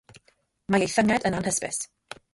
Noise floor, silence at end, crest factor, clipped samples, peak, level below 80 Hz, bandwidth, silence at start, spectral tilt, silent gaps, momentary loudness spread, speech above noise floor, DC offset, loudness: -67 dBFS; 0.5 s; 18 dB; under 0.1%; -8 dBFS; -56 dBFS; 11.5 kHz; 0.7 s; -4 dB/octave; none; 18 LU; 42 dB; under 0.1%; -25 LUFS